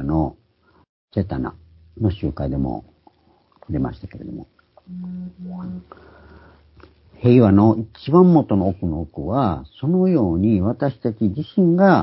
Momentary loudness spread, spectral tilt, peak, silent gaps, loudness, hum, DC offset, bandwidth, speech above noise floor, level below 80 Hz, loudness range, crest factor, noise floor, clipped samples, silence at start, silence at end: 19 LU; -13.5 dB/octave; 0 dBFS; 0.89-1.08 s; -19 LUFS; none; under 0.1%; 5.8 kHz; 40 dB; -38 dBFS; 15 LU; 20 dB; -58 dBFS; under 0.1%; 0 s; 0 s